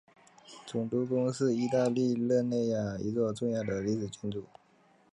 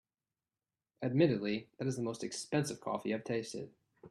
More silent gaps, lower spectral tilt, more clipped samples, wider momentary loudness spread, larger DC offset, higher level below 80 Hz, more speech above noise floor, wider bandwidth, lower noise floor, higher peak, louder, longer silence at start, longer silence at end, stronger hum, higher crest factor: neither; first, -7 dB/octave vs -5.5 dB/octave; neither; about the same, 10 LU vs 11 LU; neither; first, -64 dBFS vs -74 dBFS; second, 34 dB vs over 55 dB; second, 11 kHz vs 13.5 kHz; second, -65 dBFS vs under -90 dBFS; about the same, -16 dBFS vs -16 dBFS; first, -31 LUFS vs -36 LUFS; second, 0.5 s vs 1 s; first, 0.7 s vs 0 s; neither; about the same, 16 dB vs 20 dB